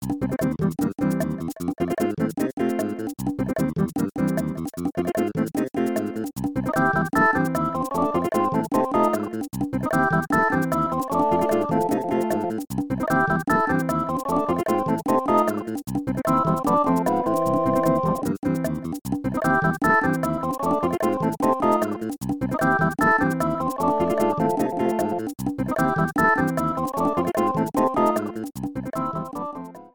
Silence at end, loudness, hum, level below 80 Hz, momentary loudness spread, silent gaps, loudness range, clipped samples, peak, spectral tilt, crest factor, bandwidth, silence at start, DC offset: 0.05 s; -23 LUFS; none; -48 dBFS; 8 LU; 2.53-2.57 s; 3 LU; under 0.1%; -6 dBFS; -7 dB/octave; 16 dB; over 20 kHz; 0 s; 0.3%